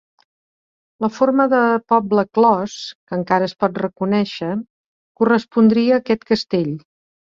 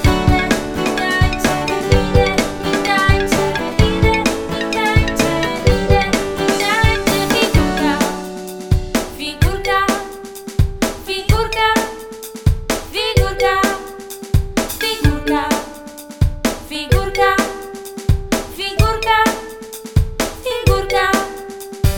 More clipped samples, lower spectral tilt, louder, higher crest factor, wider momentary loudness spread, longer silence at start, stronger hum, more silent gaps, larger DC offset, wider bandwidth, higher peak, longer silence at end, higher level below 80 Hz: neither; first, -6.5 dB/octave vs -5 dB/octave; about the same, -18 LUFS vs -17 LUFS; about the same, 16 dB vs 16 dB; about the same, 11 LU vs 11 LU; first, 1 s vs 0 s; neither; first, 2.95-3.07 s, 4.70-5.15 s vs none; neither; second, 7.4 kHz vs over 20 kHz; about the same, -2 dBFS vs 0 dBFS; first, 0.6 s vs 0 s; second, -60 dBFS vs -24 dBFS